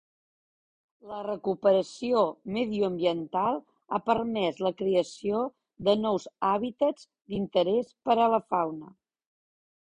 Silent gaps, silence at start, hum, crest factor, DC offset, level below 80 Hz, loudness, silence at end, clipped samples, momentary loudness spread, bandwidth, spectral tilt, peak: none; 1.05 s; none; 18 dB; under 0.1%; -66 dBFS; -28 LUFS; 1 s; under 0.1%; 10 LU; 10 kHz; -6 dB/octave; -10 dBFS